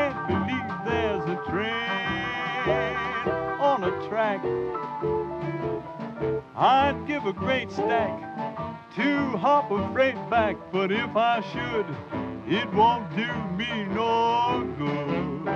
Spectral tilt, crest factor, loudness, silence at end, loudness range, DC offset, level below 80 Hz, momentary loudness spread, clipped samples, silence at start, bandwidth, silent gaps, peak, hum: -6.5 dB/octave; 18 dB; -26 LUFS; 0 s; 2 LU; under 0.1%; -52 dBFS; 9 LU; under 0.1%; 0 s; 8 kHz; none; -8 dBFS; none